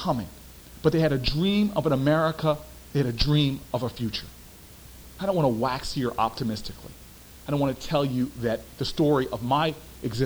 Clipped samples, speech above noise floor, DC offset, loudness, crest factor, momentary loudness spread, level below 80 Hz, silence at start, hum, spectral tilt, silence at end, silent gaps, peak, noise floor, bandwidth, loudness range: under 0.1%; 21 dB; under 0.1%; -26 LUFS; 18 dB; 21 LU; -44 dBFS; 0 s; none; -6.5 dB/octave; 0 s; none; -8 dBFS; -46 dBFS; over 20 kHz; 5 LU